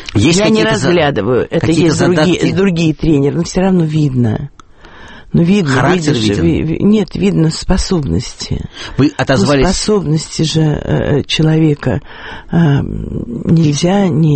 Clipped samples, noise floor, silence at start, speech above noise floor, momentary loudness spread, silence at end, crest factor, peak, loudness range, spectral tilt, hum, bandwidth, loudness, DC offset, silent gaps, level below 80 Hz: under 0.1%; -36 dBFS; 0 s; 24 dB; 9 LU; 0 s; 12 dB; 0 dBFS; 2 LU; -6 dB/octave; none; 8.8 kHz; -13 LUFS; under 0.1%; none; -28 dBFS